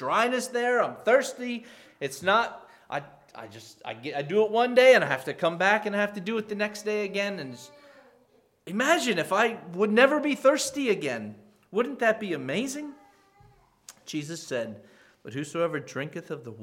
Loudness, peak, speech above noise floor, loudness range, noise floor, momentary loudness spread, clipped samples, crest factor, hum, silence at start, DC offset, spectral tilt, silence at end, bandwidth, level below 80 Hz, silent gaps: -26 LUFS; -4 dBFS; 37 dB; 11 LU; -64 dBFS; 16 LU; under 0.1%; 22 dB; none; 0 s; under 0.1%; -4 dB/octave; 0 s; 16.5 kHz; -74 dBFS; none